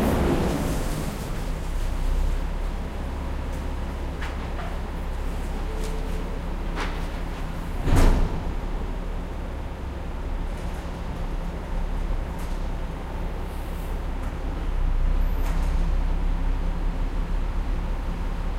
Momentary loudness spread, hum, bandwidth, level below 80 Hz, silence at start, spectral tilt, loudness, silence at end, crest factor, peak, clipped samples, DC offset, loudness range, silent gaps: 8 LU; none; 15 kHz; -26 dBFS; 0 s; -6.5 dB/octave; -30 LUFS; 0 s; 20 dB; -6 dBFS; under 0.1%; under 0.1%; 4 LU; none